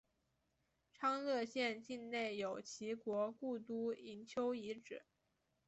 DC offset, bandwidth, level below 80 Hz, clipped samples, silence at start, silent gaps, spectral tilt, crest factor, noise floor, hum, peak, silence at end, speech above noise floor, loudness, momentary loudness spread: under 0.1%; 8.2 kHz; -86 dBFS; under 0.1%; 1 s; none; -4 dB/octave; 18 dB; -84 dBFS; none; -26 dBFS; 0.65 s; 41 dB; -43 LUFS; 9 LU